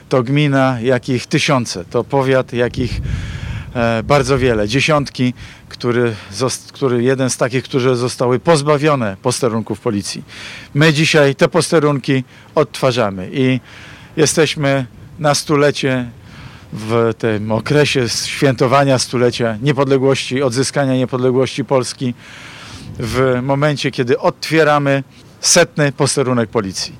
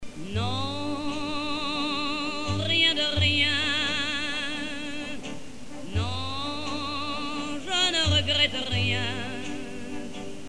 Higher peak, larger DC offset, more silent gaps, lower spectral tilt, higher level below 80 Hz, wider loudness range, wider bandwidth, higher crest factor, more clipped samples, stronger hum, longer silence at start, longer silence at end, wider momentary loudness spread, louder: first, -2 dBFS vs -8 dBFS; second, under 0.1% vs 1%; neither; first, -5 dB/octave vs -3.5 dB/octave; first, -40 dBFS vs -48 dBFS; second, 3 LU vs 7 LU; first, 16 kHz vs 12 kHz; second, 14 dB vs 20 dB; neither; neither; about the same, 0.1 s vs 0 s; about the same, 0 s vs 0 s; second, 11 LU vs 15 LU; first, -15 LUFS vs -26 LUFS